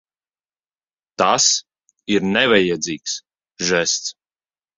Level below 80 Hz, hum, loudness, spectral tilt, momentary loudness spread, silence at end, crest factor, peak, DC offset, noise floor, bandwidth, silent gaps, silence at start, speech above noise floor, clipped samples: -58 dBFS; none; -18 LUFS; -2 dB/octave; 14 LU; 0.65 s; 20 dB; -2 dBFS; under 0.1%; under -90 dBFS; 7.8 kHz; none; 1.2 s; over 72 dB; under 0.1%